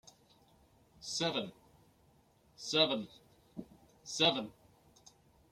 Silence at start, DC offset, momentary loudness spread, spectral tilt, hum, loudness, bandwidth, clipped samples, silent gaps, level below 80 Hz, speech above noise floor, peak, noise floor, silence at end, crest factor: 1 s; under 0.1%; 21 LU; -3 dB/octave; none; -33 LUFS; 16 kHz; under 0.1%; none; -74 dBFS; 34 dB; -14 dBFS; -68 dBFS; 1 s; 26 dB